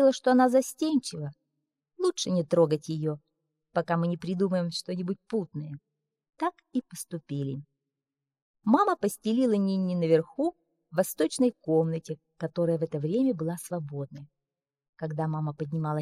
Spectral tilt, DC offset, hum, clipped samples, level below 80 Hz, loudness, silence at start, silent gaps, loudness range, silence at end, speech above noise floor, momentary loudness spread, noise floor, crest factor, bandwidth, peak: -6.5 dB/octave; under 0.1%; none; under 0.1%; -72 dBFS; -28 LUFS; 0 s; 8.42-8.54 s, 14.89-14.93 s; 6 LU; 0 s; 62 dB; 14 LU; -89 dBFS; 20 dB; 15.5 kHz; -8 dBFS